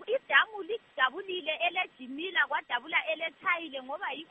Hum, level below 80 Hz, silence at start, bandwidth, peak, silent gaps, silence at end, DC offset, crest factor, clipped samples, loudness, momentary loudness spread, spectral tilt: none; -82 dBFS; 0 s; 8 kHz; -8 dBFS; none; 0.05 s; under 0.1%; 22 dB; under 0.1%; -30 LUFS; 12 LU; 3 dB/octave